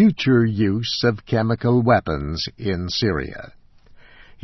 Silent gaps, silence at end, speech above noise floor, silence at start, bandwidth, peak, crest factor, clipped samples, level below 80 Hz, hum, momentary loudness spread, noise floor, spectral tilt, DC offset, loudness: none; 0.95 s; 28 dB; 0 s; 6.2 kHz; -4 dBFS; 16 dB; under 0.1%; -42 dBFS; none; 9 LU; -47 dBFS; -6.5 dB/octave; under 0.1%; -20 LUFS